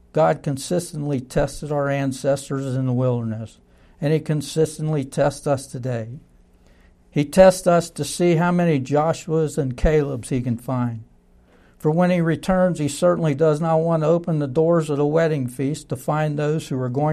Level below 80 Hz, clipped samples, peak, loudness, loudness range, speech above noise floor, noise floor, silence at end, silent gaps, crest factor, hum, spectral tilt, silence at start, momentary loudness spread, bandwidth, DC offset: -40 dBFS; under 0.1%; 0 dBFS; -21 LUFS; 5 LU; 33 dB; -53 dBFS; 0 s; none; 20 dB; none; -6.5 dB/octave; 0.15 s; 8 LU; 14 kHz; under 0.1%